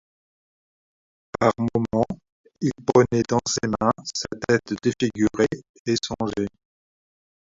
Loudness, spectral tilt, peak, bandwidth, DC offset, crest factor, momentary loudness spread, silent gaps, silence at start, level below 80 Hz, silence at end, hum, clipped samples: -23 LUFS; -5 dB/octave; -4 dBFS; 7.8 kHz; under 0.1%; 22 dB; 9 LU; 2.32-2.44 s, 5.69-5.85 s; 1.4 s; -52 dBFS; 1.05 s; none; under 0.1%